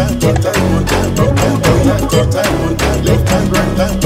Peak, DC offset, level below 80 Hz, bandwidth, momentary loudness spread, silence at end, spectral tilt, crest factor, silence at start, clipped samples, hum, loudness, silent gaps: 0 dBFS; under 0.1%; -22 dBFS; 16.5 kHz; 3 LU; 0 s; -5.5 dB/octave; 12 dB; 0 s; under 0.1%; none; -12 LUFS; none